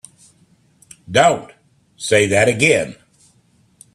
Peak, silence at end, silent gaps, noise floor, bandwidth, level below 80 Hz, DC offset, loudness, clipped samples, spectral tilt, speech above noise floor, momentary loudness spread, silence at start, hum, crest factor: 0 dBFS; 1 s; none; -57 dBFS; 13.5 kHz; -54 dBFS; under 0.1%; -15 LUFS; under 0.1%; -4 dB/octave; 42 dB; 13 LU; 1.1 s; none; 20 dB